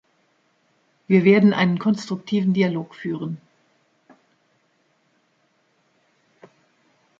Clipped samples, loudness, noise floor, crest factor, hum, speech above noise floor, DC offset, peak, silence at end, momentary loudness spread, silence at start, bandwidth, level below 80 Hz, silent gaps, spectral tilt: under 0.1%; -20 LUFS; -66 dBFS; 20 dB; none; 47 dB; under 0.1%; -4 dBFS; 3.85 s; 15 LU; 1.1 s; 7.6 kHz; -70 dBFS; none; -7.5 dB/octave